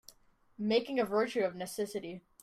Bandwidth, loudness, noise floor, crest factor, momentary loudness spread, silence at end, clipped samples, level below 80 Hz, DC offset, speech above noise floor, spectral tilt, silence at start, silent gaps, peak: 15 kHz; -34 LUFS; -65 dBFS; 16 dB; 9 LU; 0.25 s; under 0.1%; -74 dBFS; under 0.1%; 32 dB; -4.5 dB/octave; 0.6 s; none; -18 dBFS